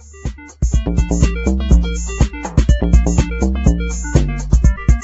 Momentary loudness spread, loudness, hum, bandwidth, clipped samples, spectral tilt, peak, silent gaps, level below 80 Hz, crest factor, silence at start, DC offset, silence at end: 7 LU; -17 LUFS; none; 8 kHz; under 0.1%; -6.5 dB/octave; 0 dBFS; none; -16 dBFS; 14 dB; 0.1 s; under 0.1%; 0 s